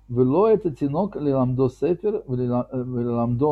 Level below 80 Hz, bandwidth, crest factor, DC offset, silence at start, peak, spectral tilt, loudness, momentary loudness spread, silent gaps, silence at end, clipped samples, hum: -50 dBFS; 7.6 kHz; 14 dB; under 0.1%; 0.1 s; -8 dBFS; -10.5 dB/octave; -23 LUFS; 7 LU; none; 0 s; under 0.1%; none